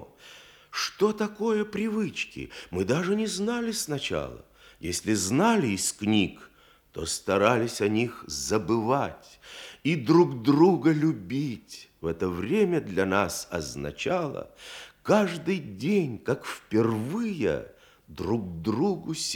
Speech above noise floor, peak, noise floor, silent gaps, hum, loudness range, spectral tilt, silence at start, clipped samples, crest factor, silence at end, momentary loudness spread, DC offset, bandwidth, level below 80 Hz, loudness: 24 dB; -6 dBFS; -51 dBFS; none; none; 4 LU; -5 dB/octave; 0 s; under 0.1%; 22 dB; 0 s; 14 LU; under 0.1%; 19 kHz; -58 dBFS; -27 LUFS